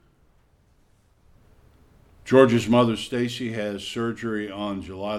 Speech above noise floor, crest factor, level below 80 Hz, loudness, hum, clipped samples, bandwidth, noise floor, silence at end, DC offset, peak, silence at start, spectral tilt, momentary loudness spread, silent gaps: 38 dB; 22 dB; -56 dBFS; -23 LUFS; none; under 0.1%; 13.5 kHz; -60 dBFS; 0 s; under 0.1%; -2 dBFS; 2.25 s; -6 dB/octave; 14 LU; none